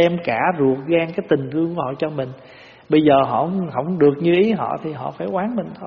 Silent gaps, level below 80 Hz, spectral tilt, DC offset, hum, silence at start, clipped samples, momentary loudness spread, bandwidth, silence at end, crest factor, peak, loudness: none; -58 dBFS; -5.5 dB/octave; under 0.1%; none; 0 s; under 0.1%; 10 LU; 6.2 kHz; 0 s; 16 dB; -2 dBFS; -19 LUFS